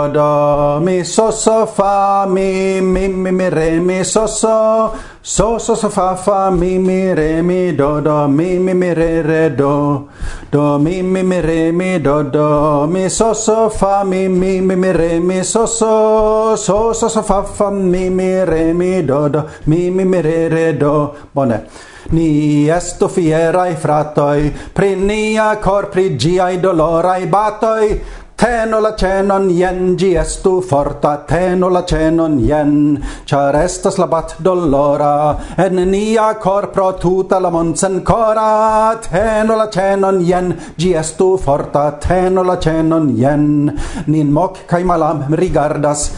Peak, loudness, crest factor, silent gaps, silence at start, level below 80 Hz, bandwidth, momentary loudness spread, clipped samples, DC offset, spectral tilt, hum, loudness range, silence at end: 0 dBFS; -14 LUFS; 12 dB; none; 0 s; -30 dBFS; 11 kHz; 4 LU; under 0.1%; under 0.1%; -6 dB/octave; none; 1 LU; 0 s